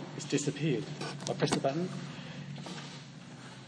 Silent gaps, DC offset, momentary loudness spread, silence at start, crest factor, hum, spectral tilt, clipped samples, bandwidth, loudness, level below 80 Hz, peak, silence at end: none; under 0.1%; 16 LU; 0 s; 22 dB; none; -5 dB/octave; under 0.1%; 10.5 kHz; -35 LUFS; -70 dBFS; -12 dBFS; 0 s